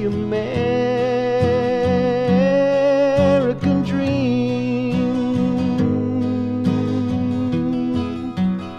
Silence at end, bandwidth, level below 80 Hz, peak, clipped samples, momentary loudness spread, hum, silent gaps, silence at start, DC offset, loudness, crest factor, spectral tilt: 0 s; 8.4 kHz; -46 dBFS; -4 dBFS; under 0.1%; 5 LU; none; none; 0 s; under 0.1%; -19 LUFS; 14 dB; -8 dB/octave